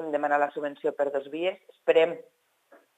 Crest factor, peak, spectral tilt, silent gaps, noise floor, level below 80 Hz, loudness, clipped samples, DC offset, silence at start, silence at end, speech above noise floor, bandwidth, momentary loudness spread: 20 dB; -8 dBFS; -5.5 dB/octave; none; -60 dBFS; under -90 dBFS; -27 LUFS; under 0.1%; under 0.1%; 0 s; 0.75 s; 33 dB; 9 kHz; 9 LU